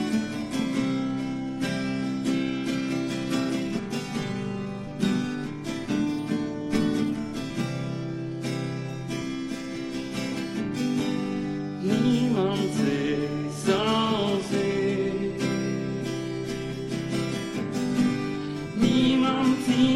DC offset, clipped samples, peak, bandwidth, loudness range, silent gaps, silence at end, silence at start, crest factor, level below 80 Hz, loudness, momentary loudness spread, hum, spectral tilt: under 0.1%; under 0.1%; -10 dBFS; 13.5 kHz; 5 LU; none; 0 s; 0 s; 18 dB; -54 dBFS; -27 LUFS; 9 LU; none; -6 dB/octave